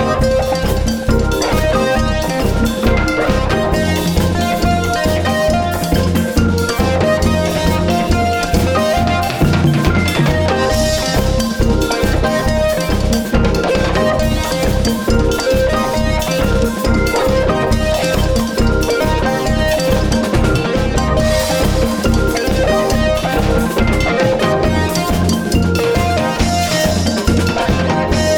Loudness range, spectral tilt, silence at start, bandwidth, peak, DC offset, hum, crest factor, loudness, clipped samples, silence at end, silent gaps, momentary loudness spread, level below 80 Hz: 1 LU; -5.5 dB/octave; 0 s; over 20 kHz; -2 dBFS; under 0.1%; none; 12 dB; -15 LUFS; under 0.1%; 0 s; none; 2 LU; -22 dBFS